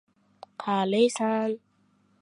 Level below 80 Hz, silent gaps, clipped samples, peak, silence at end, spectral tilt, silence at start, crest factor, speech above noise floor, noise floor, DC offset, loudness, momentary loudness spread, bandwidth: -80 dBFS; none; under 0.1%; -10 dBFS; 0.65 s; -5 dB/octave; 0.6 s; 18 dB; 41 dB; -66 dBFS; under 0.1%; -26 LUFS; 14 LU; 11.5 kHz